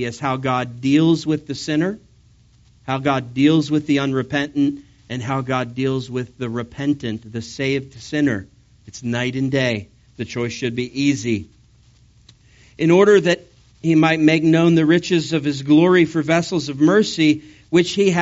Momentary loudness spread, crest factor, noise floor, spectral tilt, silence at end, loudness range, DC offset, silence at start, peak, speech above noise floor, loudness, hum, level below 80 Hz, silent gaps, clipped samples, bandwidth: 12 LU; 16 dB; -52 dBFS; -5.5 dB/octave; 0 s; 8 LU; under 0.1%; 0 s; -2 dBFS; 34 dB; -19 LUFS; none; -54 dBFS; none; under 0.1%; 8 kHz